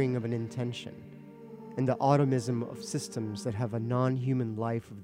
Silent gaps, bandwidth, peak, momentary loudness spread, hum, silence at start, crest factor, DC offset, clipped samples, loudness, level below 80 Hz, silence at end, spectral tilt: none; 13.5 kHz; -10 dBFS; 20 LU; none; 0 s; 20 dB; under 0.1%; under 0.1%; -31 LUFS; -70 dBFS; 0 s; -7 dB/octave